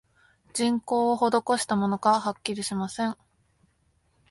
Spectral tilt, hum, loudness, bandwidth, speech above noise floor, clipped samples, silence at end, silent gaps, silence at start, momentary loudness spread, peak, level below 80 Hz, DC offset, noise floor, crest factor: -4.5 dB/octave; none; -26 LUFS; 11.5 kHz; 43 dB; under 0.1%; 1.15 s; none; 0.55 s; 8 LU; -8 dBFS; -66 dBFS; under 0.1%; -68 dBFS; 20 dB